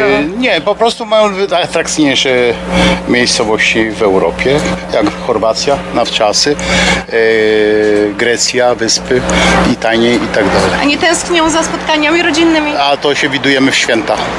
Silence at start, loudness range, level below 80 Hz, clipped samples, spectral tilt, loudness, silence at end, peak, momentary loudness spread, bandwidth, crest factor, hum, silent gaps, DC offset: 0 s; 1 LU; -32 dBFS; under 0.1%; -3.5 dB/octave; -10 LUFS; 0 s; 0 dBFS; 4 LU; 11.5 kHz; 10 dB; none; none; under 0.1%